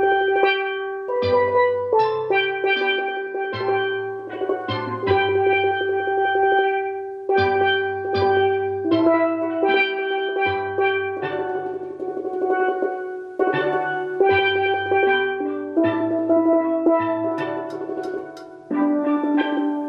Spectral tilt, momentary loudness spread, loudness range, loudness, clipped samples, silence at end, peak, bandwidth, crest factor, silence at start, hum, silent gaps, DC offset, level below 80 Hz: -7 dB/octave; 10 LU; 3 LU; -21 LUFS; under 0.1%; 0 s; -4 dBFS; 5.8 kHz; 16 dB; 0 s; none; none; under 0.1%; -66 dBFS